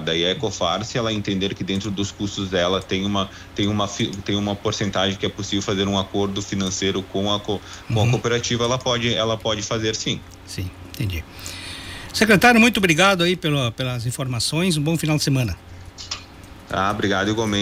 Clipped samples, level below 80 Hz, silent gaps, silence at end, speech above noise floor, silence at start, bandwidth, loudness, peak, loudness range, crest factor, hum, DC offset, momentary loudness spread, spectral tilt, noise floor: under 0.1%; -44 dBFS; none; 0 s; 20 dB; 0 s; 16 kHz; -21 LUFS; -4 dBFS; 6 LU; 18 dB; none; under 0.1%; 15 LU; -4.5 dB/octave; -41 dBFS